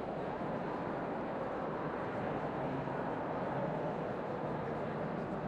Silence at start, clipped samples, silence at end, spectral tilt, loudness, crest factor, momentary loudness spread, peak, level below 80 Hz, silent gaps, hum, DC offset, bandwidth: 0 s; under 0.1%; 0 s; -8.5 dB/octave; -39 LUFS; 14 dB; 2 LU; -26 dBFS; -62 dBFS; none; none; under 0.1%; 9.8 kHz